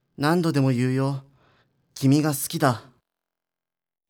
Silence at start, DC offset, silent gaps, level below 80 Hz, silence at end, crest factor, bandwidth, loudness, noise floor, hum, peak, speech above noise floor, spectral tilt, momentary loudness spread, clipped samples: 0.2 s; under 0.1%; none; -70 dBFS; 1.3 s; 18 dB; 19 kHz; -23 LUFS; under -90 dBFS; none; -6 dBFS; over 68 dB; -6 dB/octave; 11 LU; under 0.1%